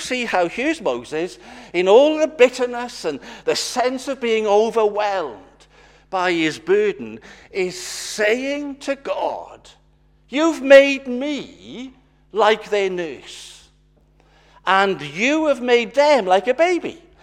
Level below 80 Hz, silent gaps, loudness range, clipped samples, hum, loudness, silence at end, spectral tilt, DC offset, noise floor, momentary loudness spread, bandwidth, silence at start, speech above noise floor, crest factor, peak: -56 dBFS; none; 6 LU; under 0.1%; none; -19 LUFS; 0.25 s; -3.5 dB/octave; under 0.1%; -56 dBFS; 16 LU; 14 kHz; 0 s; 37 dB; 20 dB; 0 dBFS